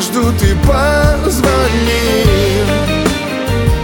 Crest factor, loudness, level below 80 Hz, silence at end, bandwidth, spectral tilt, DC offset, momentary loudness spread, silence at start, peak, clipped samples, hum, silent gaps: 12 dB; -12 LUFS; -18 dBFS; 0 s; 20 kHz; -5 dB/octave; under 0.1%; 3 LU; 0 s; 0 dBFS; under 0.1%; none; none